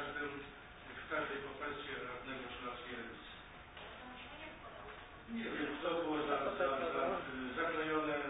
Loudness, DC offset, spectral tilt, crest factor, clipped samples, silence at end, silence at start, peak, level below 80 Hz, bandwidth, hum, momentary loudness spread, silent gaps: -41 LUFS; under 0.1%; 0 dB/octave; 18 dB; under 0.1%; 0 s; 0 s; -24 dBFS; -64 dBFS; 3.9 kHz; none; 15 LU; none